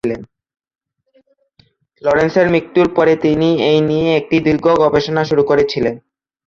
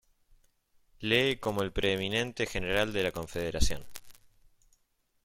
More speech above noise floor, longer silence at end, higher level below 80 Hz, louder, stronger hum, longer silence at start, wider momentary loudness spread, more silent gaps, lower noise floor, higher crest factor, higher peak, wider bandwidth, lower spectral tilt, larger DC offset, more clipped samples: about the same, 44 dB vs 44 dB; second, 0.5 s vs 1.1 s; about the same, -46 dBFS vs -42 dBFS; first, -14 LUFS vs -30 LUFS; neither; second, 0.05 s vs 1 s; second, 8 LU vs 12 LU; neither; second, -57 dBFS vs -74 dBFS; second, 14 dB vs 22 dB; first, -2 dBFS vs -10 dBFS; second, 7.4 kHz vs 16.5 kHz; first, -7 dB/octave vs -4 dB/octave; neither; neither